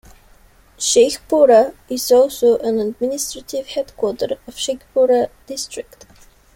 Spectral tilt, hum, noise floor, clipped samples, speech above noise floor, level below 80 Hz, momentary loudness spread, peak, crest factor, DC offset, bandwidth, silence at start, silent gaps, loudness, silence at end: -2.5 dB/octave; none; -49 dBFS; under 0.1%; 32 dB; -52 dBFS; 14 LU; -2 dBFS; 16 dB; under 0.1%; 16.5 kHz; 0.8 s; none; -17 LUFS; 0.75 s